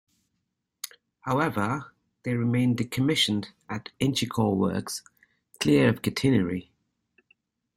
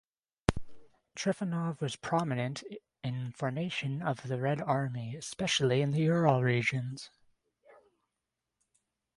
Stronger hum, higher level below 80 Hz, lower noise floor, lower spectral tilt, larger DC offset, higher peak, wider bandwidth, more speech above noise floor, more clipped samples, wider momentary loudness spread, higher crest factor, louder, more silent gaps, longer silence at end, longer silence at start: neither; about the same, -58 dBFS vs -56 dBFS; second, -80 dBFS vs -87 dBFS; about the same, -5.5 dB/octave vs -5.5 dB/octave; neither; about the same, -8 dBFS vs -6 dBFS; first, 16 kHz vs 11.5 kHz; about the same, 55 dB vs 56 dB; neither; about the same, 15 LU vs 14 LU; second, 20 dB vs 26 dB; first, -26 LUFS vs -32 LUFS; neither; second, 1.15 s vs 2.1 s; first, 0.85 s vs 0.5 s